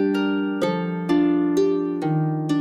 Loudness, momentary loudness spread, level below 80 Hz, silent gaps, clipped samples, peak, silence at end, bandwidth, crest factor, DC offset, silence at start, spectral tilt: -22 LUFS; 4 LU; -60 dBFS; none; under 0.1%; -8 dBFS; 0 s; 10.5 kHz; 12 dB; under 0.1%; 0 s; -7.5 dB/octave